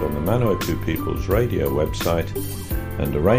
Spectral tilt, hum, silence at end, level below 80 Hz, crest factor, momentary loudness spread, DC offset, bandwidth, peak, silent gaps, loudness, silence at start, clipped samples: -6.5 dB/octave; none; 0 s; -32 dBFS; 16 dB; 7 LU; under 0.1%; 15.5 kHz; -4 dBFS; none; -23 LUFS; 0 s; under 0.1%